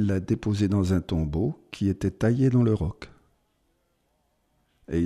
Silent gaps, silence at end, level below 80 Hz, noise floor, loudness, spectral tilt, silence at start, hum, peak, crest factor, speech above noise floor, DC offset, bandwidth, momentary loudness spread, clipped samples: none; 0 s; -44 dBFS; -71 dBFS; -25 LUFS; -8 dB/octave; 0 s; 60 Hz at -45 dBFS; -10 dBFS; 16 dB; 47 dB; under 0.1%; 12 kHz; 9 LU; under 0.1%